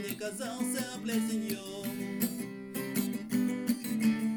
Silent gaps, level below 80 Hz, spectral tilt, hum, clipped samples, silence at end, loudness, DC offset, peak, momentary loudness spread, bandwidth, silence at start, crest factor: none; -74 dBFS; -4.5 dB/octave; none; under 0.1%; 0 s; -34 LUFS; under 0.1%; -18 dBFS; 7 LU; 19.5 kHz; 0 s; 16 dB